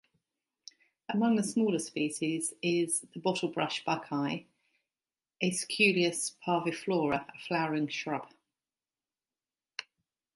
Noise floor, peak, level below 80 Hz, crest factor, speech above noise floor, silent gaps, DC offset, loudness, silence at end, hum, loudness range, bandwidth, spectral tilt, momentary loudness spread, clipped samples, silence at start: under -90 dBFS; -12 dBFS; -76 dBFS; 22 dB; over 59 dB; none; under 0.1%; -31 LUFS; 0.55 s; none; 4 LU; 12 kHz; -4 dB/octave; 10 LU; under 0.1%; 1.1 s